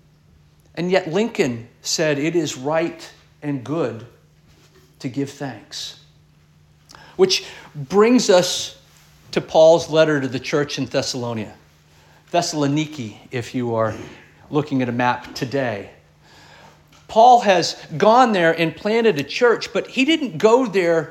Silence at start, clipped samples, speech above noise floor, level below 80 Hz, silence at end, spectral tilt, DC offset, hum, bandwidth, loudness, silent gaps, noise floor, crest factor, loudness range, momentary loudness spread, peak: 0.75 s; under 0.1%; 35 dB; -60 dBFS; 0 s; -4.5 dB/octave; under 0.1%; none; 16 kHz; -19 LUFS; none; -53 dBFS; 18 dB; 10 LU; 17 LU; -2 dBFS